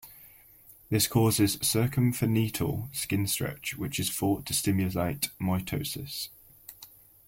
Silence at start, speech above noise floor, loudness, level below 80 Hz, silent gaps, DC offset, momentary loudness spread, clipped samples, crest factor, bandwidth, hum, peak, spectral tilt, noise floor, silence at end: 0.05 s; 27 dB; -28 LUFS; -54 dBFS; none; under 0.1%; 15 LU; under 0.1%; 18 dB; 16.5 kHz; none; -12 dBFS; -4.5 dB/octave; -55 dBFS; 0.4 s